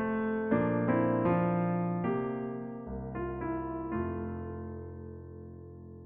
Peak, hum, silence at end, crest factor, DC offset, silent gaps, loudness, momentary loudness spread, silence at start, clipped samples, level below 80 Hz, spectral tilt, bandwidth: -16 dBFS; none; 0 s; 18 dB; under 0.1%; none; -32 LUFS; 18 LU; 0 s; under 0.1%; -52 dBFS; -9 dB/octave; 3.6 kHz